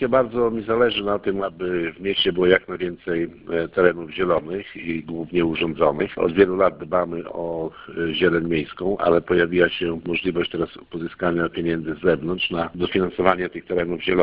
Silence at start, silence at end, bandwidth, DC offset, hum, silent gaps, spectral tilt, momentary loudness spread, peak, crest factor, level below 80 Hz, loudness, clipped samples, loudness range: 0 s; 0 s; 5.2 kHz; under 0.1%; none; none; -9.5 dB/octave; 10 LU; 0 dBFS; 22 dB; -48 dBFS; -22 LUFS; under 0.1%; 2 LU